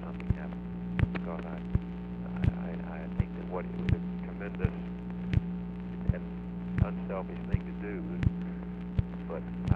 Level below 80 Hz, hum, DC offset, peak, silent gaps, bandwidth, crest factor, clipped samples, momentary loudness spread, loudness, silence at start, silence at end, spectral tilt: -42 dBFS; 60 Hz at -45 dBFS; under 0.1%; -10 dBFS; none; 5 kHz; 24 dB; under 0.1%; 7 LU; -35 LUFS; 0 s; 0 s; -10 dB/octave